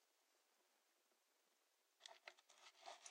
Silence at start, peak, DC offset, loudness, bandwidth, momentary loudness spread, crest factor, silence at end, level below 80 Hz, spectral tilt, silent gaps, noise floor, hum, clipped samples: 0 s; -38 dBFS; under 0.1%; -63 LUFS; 15.5 kHz; 7 LU; 30 dB; 0 s; under -90 dBFS; 2.5 dB/octave; none; -84 dBFS; none; under 0.1%